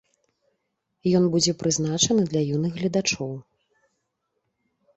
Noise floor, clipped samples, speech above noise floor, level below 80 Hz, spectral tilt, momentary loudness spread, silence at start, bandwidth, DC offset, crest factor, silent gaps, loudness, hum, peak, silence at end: -77 dBFS; under 0.1%; 54 dB; -60 dBFS; -4.5 dB/octave; 9 LU; 1.05 s; 8.2 kHz; under 0.1%; 20 dB; none; -23 LUFS; none; -6 dBFS; 1.55 s